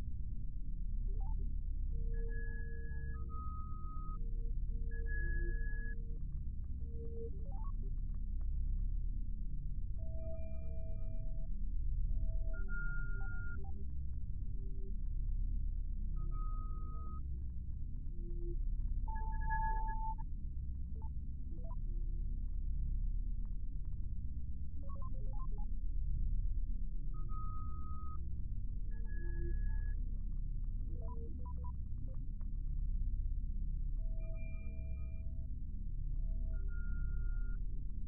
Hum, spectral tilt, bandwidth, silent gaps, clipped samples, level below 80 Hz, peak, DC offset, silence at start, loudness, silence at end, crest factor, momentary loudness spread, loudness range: none; -5.5 dB/octave; 2.5 kHz; none; under 0.1%; -38 dBFS; -24 dBFS; under 0.1%; 0 s; -45 LUFS; 0 s; 12 dB; 5 LU; 2 LU